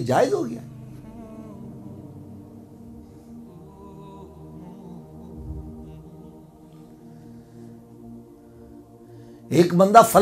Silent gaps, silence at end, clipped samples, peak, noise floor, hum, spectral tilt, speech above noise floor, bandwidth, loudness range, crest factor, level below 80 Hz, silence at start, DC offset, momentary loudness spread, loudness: none; 0 s; under 0.1%; 0 dBFS; -46 dBFS; none; -6 dB/octave; 30 dB; 14.5 kHz; 17 LU; 26 dB; -52 dBFS; 0 s; under 0.1%; 25 LU; -18 LUFS